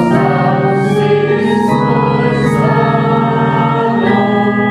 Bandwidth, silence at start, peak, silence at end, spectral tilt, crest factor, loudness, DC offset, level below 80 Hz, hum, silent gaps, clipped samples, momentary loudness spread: 11.5 kHz; 0 s; 0 dBFS; 0 s; -8 dB/octave; 12 dB; -12 LUFS; under 0.1%; -42 dBFS; none; none; under 0.1%; 1 LU